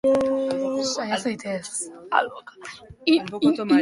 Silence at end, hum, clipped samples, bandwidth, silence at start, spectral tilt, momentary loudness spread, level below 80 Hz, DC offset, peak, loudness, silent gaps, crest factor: 0 s; none; under 0.1%; 11.5 kHz; 0.05 s; -4 dB/octave; 16 LU; -60 dBFS; under 0.1%; -4 dBFS; -24 LUFS; none; 20 dB